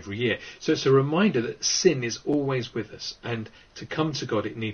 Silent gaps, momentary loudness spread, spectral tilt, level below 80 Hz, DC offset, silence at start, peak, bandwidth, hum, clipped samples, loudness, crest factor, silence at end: none; 13 LU; -4.5 dB/octave; -60 dBFS; under 0.1%; 0 s; -6 dBFS; 6.8 kHz; none; under 0.1%; -25 LUFS; 20 dB; 0 s